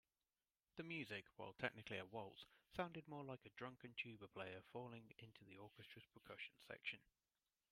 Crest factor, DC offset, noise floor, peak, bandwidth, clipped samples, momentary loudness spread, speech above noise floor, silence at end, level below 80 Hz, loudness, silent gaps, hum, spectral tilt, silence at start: 28 dB; under 0.1%; under -90 dBFS; -28 dBFS; 15.5 kHz; under 0.1%; 13 LU; over 35 dB; 0.7 s; -84 dBFS; -54 LUFS; none; none; -5.5 dB/octave; 0.75 s